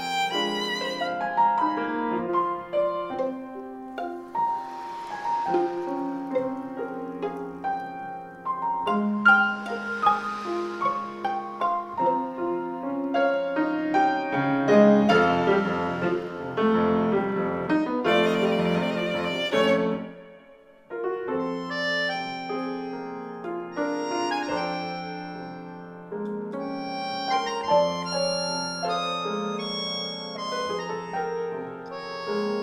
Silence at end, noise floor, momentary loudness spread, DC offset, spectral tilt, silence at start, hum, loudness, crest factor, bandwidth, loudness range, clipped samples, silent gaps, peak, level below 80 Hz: 0 s; -52 dBFS; 13 LU; under 0.1%; -5.5 dB/octave; 0 s; none; -26 LUFS; 20 dB; 15 kHz; 8 LU; under 0.1%; none; -6 dBFS; -64 dBFS